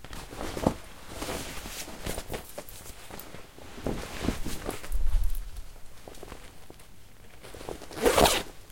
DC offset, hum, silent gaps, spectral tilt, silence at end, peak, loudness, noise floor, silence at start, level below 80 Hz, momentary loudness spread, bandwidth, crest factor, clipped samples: 0.4%; none; none; -3.5 dB/octave; 0 s; -6 dBFS; -31 LUFS; -51 dBFS; 0.05 s; -36 dBFS; 23 LU; 17 kHz; 26 dB; under 0.1%